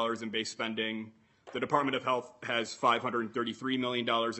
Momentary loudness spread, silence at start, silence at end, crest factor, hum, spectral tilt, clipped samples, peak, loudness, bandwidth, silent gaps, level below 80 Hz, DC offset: 7 LU; 0 s; 0 s; 22 dB; none; -4 dB/octave; under 0.1%; -12 dBFS; -32 LUFS; 8.4 kHz; none; -78 dBFS; under 0.1%